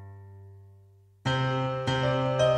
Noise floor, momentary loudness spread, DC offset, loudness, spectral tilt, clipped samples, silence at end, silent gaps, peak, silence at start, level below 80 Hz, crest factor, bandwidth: -57 dBFS; 23 LU; under 0.1%; -28 LUFS; -6 dB/octave; under 0.1%; 0 s; none; -12 dBFS; 0 s; -54 dBFS; 18 dB; 8.8 kHz